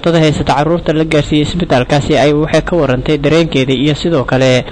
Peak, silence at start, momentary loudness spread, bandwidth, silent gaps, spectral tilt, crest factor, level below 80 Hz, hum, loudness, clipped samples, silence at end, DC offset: -4 dBFS; 0 s; 3 LU; 9.6 kHz; none; -6 dB/octave; 8 dB; -30 dBFS; none; -12 LUFS; under 0.1%; 0 s; under 0.1%